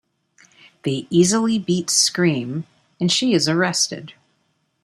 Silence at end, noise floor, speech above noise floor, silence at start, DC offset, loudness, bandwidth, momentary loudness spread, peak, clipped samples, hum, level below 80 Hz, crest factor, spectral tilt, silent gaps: 0.75 s; -68 dBFS; 49 dB; 0.85 s; under 0.1%; -19 LUFS; 15.5 kHz; 12 LU; -2 dBFS; under 0.1%; none; -62 dBFS; 18 dB; -3.5 dB/octave; none